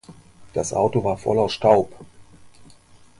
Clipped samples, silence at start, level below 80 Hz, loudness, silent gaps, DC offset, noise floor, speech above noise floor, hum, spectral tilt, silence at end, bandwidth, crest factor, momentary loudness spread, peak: under 0.1%; 0.1 s; -52 dBFS; -21 LUFS; none; under 0.1%; -50 dBFS; 29 dB; none; -5.5 dB/octave; 0.55 s; 11.5 kHz; 20 dB; 11 LU; -4 dBFS